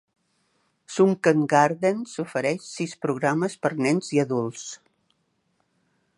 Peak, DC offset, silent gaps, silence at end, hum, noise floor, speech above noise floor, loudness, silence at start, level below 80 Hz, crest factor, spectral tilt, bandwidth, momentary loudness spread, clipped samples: -4 dBFS; under 0.1%; none; 1.4 s; none; -71 dBFS; 48 dB; -24 LUFS; 0.9 s; -74 dBFS; 20 dB; -5.5 dB/octave; 11.5 kHz; 13 LU; under 0.1%